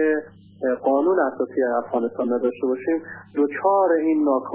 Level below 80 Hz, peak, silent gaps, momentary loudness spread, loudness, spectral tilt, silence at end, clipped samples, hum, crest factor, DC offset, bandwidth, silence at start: -68 dBFS; -6 dBFS; none; 7 LU; -22 LUFS; -10.5 dB/octave; 0 s; under 0.1%; none; 14 dB; under 0.1%; 3.5 kHz; 0 s